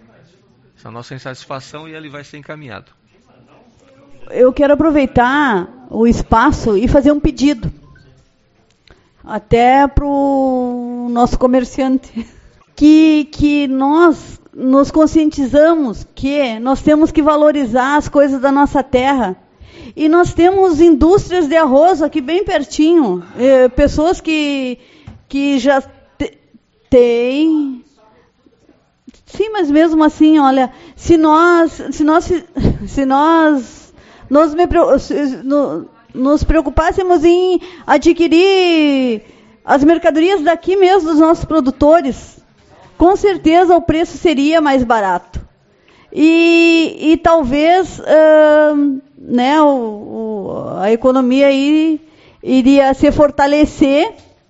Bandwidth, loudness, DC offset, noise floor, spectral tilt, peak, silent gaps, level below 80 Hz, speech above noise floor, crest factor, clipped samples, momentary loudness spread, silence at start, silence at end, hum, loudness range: 8 kHz; -12 LUFS; under 0.1%; -55 dBFS; -4.5 dB/octave; 0 dBFS; none; -32 dBFS; 43 dB; 12 dB; under 0.1%; 15 LU; 0.85 s; 0.4 s; none; 5 LU